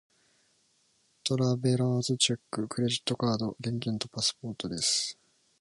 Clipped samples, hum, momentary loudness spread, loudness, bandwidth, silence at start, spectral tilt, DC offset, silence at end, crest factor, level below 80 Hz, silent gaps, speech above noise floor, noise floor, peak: under 0.1%; none; 8 LU; -29 LUFS; 11.5 kHz; 1.25 s; -4 dB/octave; under 0.1%; 0.45 s; 20 dB; -66 dBFS; none; 40 dB; -70 dBFS; -12 dBFS